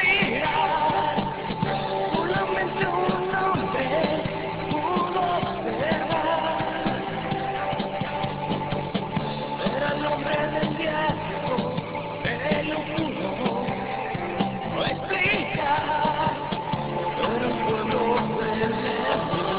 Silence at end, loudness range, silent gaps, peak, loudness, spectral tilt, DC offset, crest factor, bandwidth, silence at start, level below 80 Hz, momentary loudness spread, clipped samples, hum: 0 s; 3 LU; none; -10 dBFS; -25 LUFS; -3.5 dB/octave; under 0.1%; 16 dB; 4 kHz; 0 s; -48 dBFS; 6 LU; under 0.1%; none